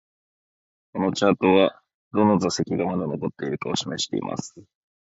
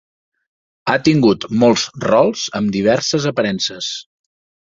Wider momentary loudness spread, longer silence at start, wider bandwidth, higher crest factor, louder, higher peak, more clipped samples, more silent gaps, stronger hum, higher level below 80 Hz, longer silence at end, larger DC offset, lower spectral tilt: first, 12 LU vs 9 LU; about the same, 0.95 s vs 0.85 s; about the same, 8 kHz vs 7.8 kHz; about the same, 20 dB vs 16 dB; second, -23 LUFS vs -16 LUFS; about the same, -4 dBFS vs -2 dBFS; neither; first, 1.94-2.11 s vs none; neither; about the same, -56 dBFS vs -54 dBFS; second, 0.45 s vs 0.7 s; neither; about the same, -5 dB/octave vs -4.5 dB/octave